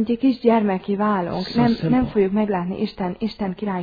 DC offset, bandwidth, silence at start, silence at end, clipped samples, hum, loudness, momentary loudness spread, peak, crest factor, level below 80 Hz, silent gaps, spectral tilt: under 0.1%; 5 kHz; 0 s; 0 s; under 0.1%; none; -21 LUFS; 8 LU; -4 dBFS; 18 dB; -46 dBFS; none; -9 dB/octave